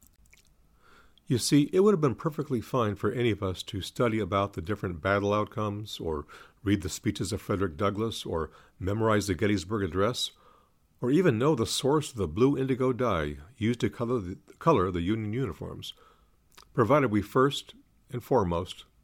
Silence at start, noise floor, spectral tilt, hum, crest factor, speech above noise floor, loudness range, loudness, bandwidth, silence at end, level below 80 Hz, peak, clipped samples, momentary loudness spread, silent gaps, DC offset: 1.3 s; -63 dBFS; -6 dB/octave; none; 20 dB; 35 dB; 3 LU; -28 LUFS; 16.5 kHz; 0.2 s; -56 dBFS; -8 dBFS; under 0.1%; 11 LU; none; under 0.1%